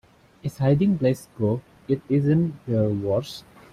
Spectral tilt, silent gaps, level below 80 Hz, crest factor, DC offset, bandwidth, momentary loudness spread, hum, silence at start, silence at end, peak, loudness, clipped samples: -8.5 dB/octave; none; -54 dBFS; 14 dB; under 0.1%; 14.5 kHz; 14 LU; none; 0.45 s; 0.35 s; -8 dBFS; -24 LUFS; under 0.1%